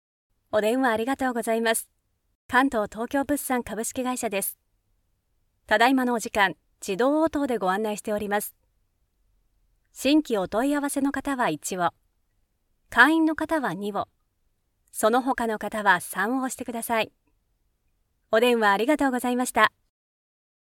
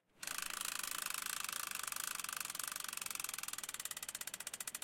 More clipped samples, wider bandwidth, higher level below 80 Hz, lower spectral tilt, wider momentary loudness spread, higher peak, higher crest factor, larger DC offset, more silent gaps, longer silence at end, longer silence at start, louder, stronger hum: neither; about the same, 18 kHz vs 17 kHz; first, -58 dBFS vs -78 dBFS; first, -3.5 dB/octave vs 1.5 dB/octave; first, 8 LU vs 4 LU; first, -2 dBFS vs -22 dBFS; about the same, 24 dB vs 22 dB; neither; first, 2.35-2.49 s vs none; first, 1.05 s vs 0 s; first, 0.55 s vs 0.15 s; first, -24 LUFS vs -41 LUFS; neither